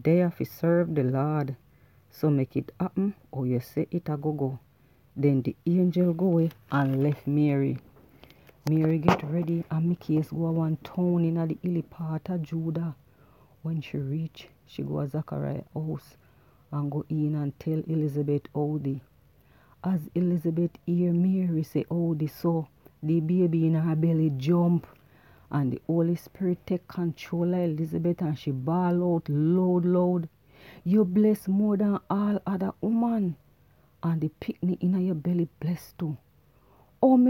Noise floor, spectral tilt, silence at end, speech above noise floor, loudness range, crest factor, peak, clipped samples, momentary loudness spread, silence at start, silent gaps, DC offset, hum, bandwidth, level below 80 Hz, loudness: -61 dBFS; -9.5 dB/octave; 0 s; 35 dB; 6 LU; 22 dB; -4 dBFS; under 0.1%; 10 LU; 0 s; none; under 0.1%; none; 16 kHz; -62 dBFS; -27 LUFS